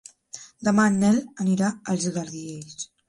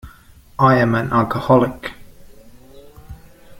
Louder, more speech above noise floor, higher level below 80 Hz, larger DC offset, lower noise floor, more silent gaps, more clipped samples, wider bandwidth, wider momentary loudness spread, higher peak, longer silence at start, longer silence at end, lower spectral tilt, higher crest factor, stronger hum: second, -23 LUFS vs -16 LUFS; second, 22 dB vs 30 dB; second, -62 dBFS vs -44 dBFS; neither; about the same, -45 dBFS vs -46 dBFS; neither; neither; second, 11.5 kHz vs 16.5 kHz; about the same, 19 LU vs 18 LU; second, -8 dBFS vs -2 dBFS; first, 0.35 s vs 0.05 s; first, 0.25 s vs 0.05 s; second, -5.5 dB/octave vs -8 dB/octave; about the same, 18 dB vs 18 dB; neither